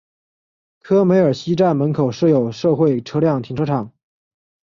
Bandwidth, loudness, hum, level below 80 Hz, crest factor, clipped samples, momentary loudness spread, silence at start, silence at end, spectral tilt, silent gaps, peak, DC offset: 7.4 kHz; -17 LUFS; none; -56 dBFS; 14 dB; under 0.1%; 7 LU; 0.85 s; 0.8 s; -8 dB/octave; none; -4 dBFS; under 0.1%